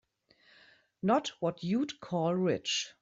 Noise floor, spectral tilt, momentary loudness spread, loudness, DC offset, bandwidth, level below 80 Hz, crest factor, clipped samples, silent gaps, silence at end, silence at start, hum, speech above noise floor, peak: -67 dBFS; -5 dB/octave; 5 LU; -32 LUFS; under 0.1%; 7.8 kHz; -72 dBFS; 18 dB; under 0.1%; none; 0.1 s; 1.05 s; none; 35 dB; -14 dBFS